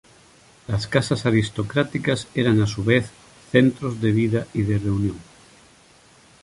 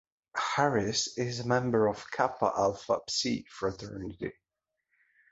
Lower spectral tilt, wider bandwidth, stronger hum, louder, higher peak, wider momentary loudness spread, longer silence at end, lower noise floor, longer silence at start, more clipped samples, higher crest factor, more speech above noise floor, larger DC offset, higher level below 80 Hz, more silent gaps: first, -6.5 dB/octave vs -4 dB/octave; first, 11.5 kHz vs 8 kHz; neither; first, -22 LUFS vs -30 LUFS; first, -2 dBFS vs -10 dBFS; second, 9 LU vs 12 LU; first, 1.2 s vs 1 s; second, -52 dBFS vs -86 dBFS; first, 0.7 s vs 0.35 s; neither; about the same, 20 dB vs 20 dB; second, 32 dB vs 55 dB; neither; first, -46 dBFS vs -60 dBFS; neither